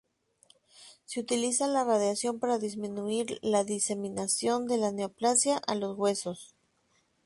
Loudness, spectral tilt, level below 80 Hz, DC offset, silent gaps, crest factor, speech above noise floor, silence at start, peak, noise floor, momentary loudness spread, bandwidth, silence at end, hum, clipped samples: -29 LUFS; -3 dB/octave; -72 dBFS; under 0.1%; none; 18 dB; 42 dB; 0.8 s; -14 dBFS; -71 dBFS; 9 LU; 11.5 kHz; 0.8 s; none; under 0.1%